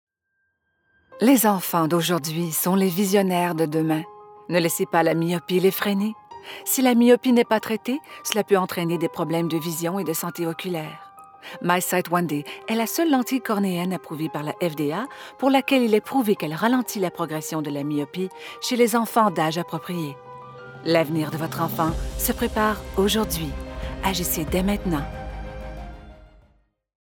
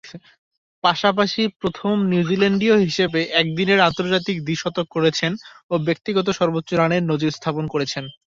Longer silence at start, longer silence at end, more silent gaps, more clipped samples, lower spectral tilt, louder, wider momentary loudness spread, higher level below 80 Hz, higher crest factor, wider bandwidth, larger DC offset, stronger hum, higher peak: first, 1.1 s vs 0.05 s; first, 0.85 s vs 0.15 s; second, none vs 0.38-0.51 s, 0.58-0.82 s, 1.56-1.60 s, 5.63-5.69 s; neither; about the same, -5 dB/octave vs -5.5 dB/octave; second, -23 LUFS vs -20 LUFS; first, 13 LU vs 7 LU; first, -42 dBFS vs -56 dBFS; about the same, 20 dB vs 18 dB; first, over 20 kHz vs 7.6 kHz; neither; neither; about the same, -4 dBFS vs -2 dBFS